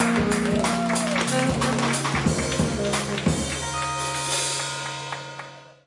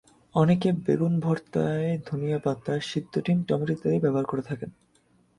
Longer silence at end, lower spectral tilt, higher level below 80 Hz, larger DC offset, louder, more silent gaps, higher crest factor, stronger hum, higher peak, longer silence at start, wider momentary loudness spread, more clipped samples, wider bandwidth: second, 0.15 s vs 0.7 s; second, -4 dB/octave vs -8 dB/octave; first, -44 dBFS vs -60 dBFS; neither; about the same, -24 LUFS vs -26 LUFS; neither; about the same, 16 dB vs 18 dB; neither; about the same, -8 dBFS vs -8 dBFS; second, 0 s vs 0.35 s; about the same, 9 LU vs 7 LU; neither; about the same, 11.5 kHz vs 11 kHz